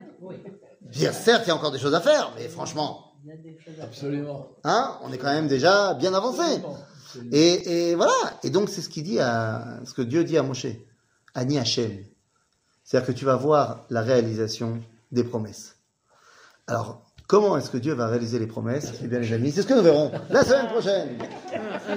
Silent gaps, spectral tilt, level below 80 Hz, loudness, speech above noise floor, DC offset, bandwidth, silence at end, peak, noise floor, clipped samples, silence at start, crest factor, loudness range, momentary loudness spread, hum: none; -5 dB/octave; -62 dBFS; -24 LUFS; 45 dB; under 0.1%; 16 kHz; 0 s; -4 dBFS; -69 dBFS; under 0.1%; 0 s; 20 dB; 5 LU; 18 LU; none